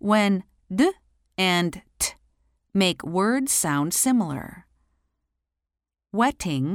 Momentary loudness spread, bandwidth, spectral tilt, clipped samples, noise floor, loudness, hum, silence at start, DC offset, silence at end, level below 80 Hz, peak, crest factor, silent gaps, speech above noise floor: 10 LU; 16.5 kHz; -4 dB/octave; under 0.1%; -82 dBFS; -23 LUFS; none; 0.05 s; under 0.1%; 0 s; -54 dBFS; -6 dBFS; 18 dB; none; 60 dB